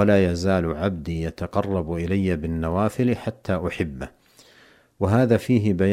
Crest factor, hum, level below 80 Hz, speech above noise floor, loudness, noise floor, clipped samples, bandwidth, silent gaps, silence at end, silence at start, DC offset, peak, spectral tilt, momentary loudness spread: 18 dB; none; -42 dBFS; 32 dB; -23 LUFS; -54 dBFS; under 0.1%; 15.5 kHz; none; 0 s; 0 s; under 0.1%; -6 dBFS; -7.5 dB/octave; 9 LU